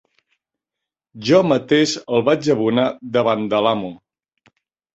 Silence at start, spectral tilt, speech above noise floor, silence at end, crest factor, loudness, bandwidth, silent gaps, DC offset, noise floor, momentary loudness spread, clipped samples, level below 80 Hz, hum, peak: 1.15 s; -5.5 dB/octave; 68 dB; 1 s; 18 dB; -18 LUFS; 8.2 kHz; none; under 0.1%; -85 dBFS; 5 LU; under 0.1%; -60 dBFS; none; -2 dBFS